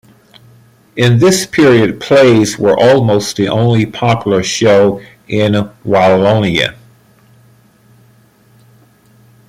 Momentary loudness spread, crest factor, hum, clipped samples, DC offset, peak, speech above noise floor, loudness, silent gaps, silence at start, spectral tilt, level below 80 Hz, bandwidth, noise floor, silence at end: 6 LU; 12 dB; none; under 0.1%; under 0.1%; 0 dBFS; 37 dB; -11 LUFS; none; 0.95 s; -5.5 dB/octave; -46 dBFS; 15.5 kHz; -47 dBFS; 2.75 s